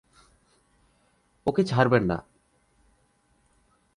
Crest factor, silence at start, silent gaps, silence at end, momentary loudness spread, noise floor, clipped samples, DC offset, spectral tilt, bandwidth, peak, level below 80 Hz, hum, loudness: 24 dB; 1.45 s; none; 1.75 s; 10 LU; -67 dBFS; under 0.1%; under 0.1%; -7.5 dB/octave; 11 kHz; -6 dBFS; -56 dBFS; none; -25 LUFS